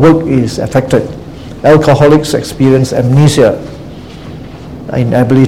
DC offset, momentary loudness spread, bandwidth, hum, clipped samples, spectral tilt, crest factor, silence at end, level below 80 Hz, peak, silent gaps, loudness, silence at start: 0.9%; 21 LU; 15.5 kHz; none; 1%; -7 dB/octave; 10 dB; 0 s; -34 dBFS; 0 dBFS; none; -9 LUFS; 0 s